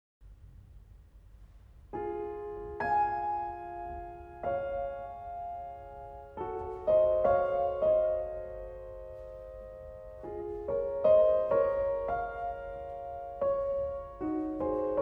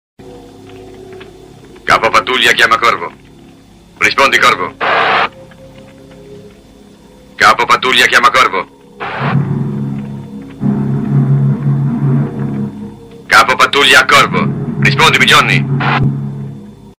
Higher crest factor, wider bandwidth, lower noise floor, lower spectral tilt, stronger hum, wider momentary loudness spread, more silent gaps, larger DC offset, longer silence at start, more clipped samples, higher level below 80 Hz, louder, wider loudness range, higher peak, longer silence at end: first, 18 dB vs 12 dB; second, 5.4 kHz vs 16 kHz; first, -55 dBFS vs -40 dBFS; first, -9 dB/octave vs -4 dB/octave; neither; about the same, 19 LU vs 17 LU; neither; neither; about the same, 0.2 s vs 0.2 s; second, under 0.1% vs 0.2%; second, -52 dBFS vs -42 dBFS; second, -32 LUFS vs -10 LUFS; about the same, 7 LU vs 7 LU; second, -14 dBFS vs 0 dBFS; about the same, 0 s vs 0.1 s